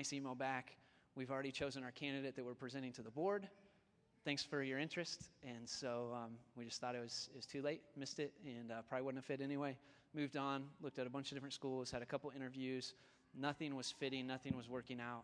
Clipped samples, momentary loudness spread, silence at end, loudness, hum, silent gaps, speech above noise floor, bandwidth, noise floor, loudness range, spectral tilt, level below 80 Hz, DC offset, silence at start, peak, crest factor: under 0.1%; 8 LU; 0 s; -47 LUFS; none; none; 29 dB; 10.5 kHz; -76 dBFS; 2 LU; -4.5 dB/octave; -78 dBFS; under 0.1%; 0 s; -26 dBFS; 20 dB